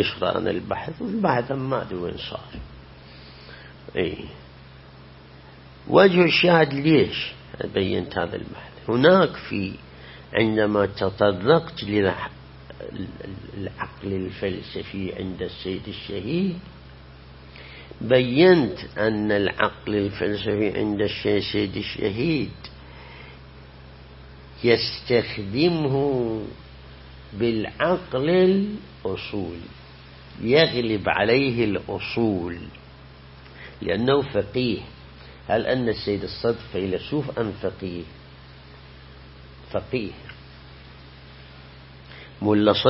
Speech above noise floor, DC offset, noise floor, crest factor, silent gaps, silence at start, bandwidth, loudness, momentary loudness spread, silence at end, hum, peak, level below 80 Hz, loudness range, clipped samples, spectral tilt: 23 dB; under 0.1%; -46 dBFS; 22 dB; none; 0 s; 5.8 kHz; -23 LUFS; 24 LU; 0 s; none; -2 dBFS; -48 dBFS; 11 LU; under 0.1%; -10 dB/octave